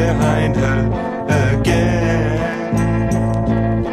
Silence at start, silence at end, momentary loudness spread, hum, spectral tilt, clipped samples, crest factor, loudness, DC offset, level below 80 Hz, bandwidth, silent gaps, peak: 0 s; 0 s; 4 LU; none; -7 dB/octave; under 0.1%; 16 dB; -17 LUFS; under 0.1%; -28 dBFS; 12.5 kHz; none; 0 dBFS